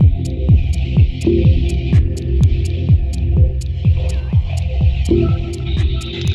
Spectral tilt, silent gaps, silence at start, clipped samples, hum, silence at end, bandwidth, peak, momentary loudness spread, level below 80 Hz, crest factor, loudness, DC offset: -8 dB/octave; none; 0 s; under 0.1%; none; 0 s; 10.5 kHz; -2 dBFS; 5 LU; -18 dBFS; 12 dB; -16 LUFS; under 0.1%